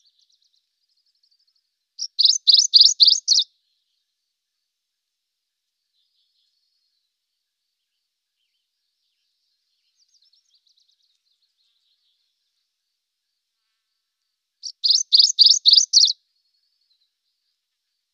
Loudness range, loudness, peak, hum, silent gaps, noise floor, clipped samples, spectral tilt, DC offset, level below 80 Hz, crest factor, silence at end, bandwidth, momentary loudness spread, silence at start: 7 LU; -13 LUFS; 0 dBFS; none; none; -80 dBFS; under 0.1%; 12 dB/octave; under 0.1%; under -90 dBFS; 22 dB; 2 s; 9.8 kHz; 20 LU; 2 s